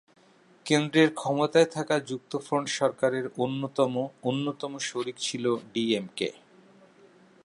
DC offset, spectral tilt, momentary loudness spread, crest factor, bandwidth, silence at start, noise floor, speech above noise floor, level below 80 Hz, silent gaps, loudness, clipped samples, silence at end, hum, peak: under 0.1%; -4.5 dB/octave; 10 LU; 20 dB; 11.5 kHz; 0.65 s; -59 dBFS; 32 dB; -76 dBFS; none; -28 LUFS; under 0.1%; 1.15 s; none; -8 dBFS